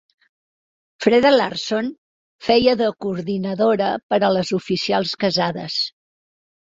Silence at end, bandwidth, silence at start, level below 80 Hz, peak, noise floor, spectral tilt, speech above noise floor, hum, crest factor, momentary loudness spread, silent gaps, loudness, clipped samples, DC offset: 0.85 s; 7.8 kHz; 1 s; -56 dBFS; -2 dBFS; under -90 dBFS; -5 dB/octave; over 71 dB; none; 18 dB; 9 LU; 1.98-2.39 s, 4.03-4.09 s; -19 LUFS; under 0.1%; under 0.1%